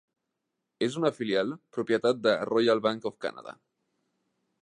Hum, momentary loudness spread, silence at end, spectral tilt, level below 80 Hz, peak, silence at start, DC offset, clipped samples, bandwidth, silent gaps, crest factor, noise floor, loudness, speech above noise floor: none; 12 LU; 1.1 s; -5.5 dB/octave; -78 dBFS; -10 dBFS; 0.8 s; under 0.1%; under 0.1%; 10.5 kHz; none; 20 dB; -83 dBFS; -28 LUFS; 56 dB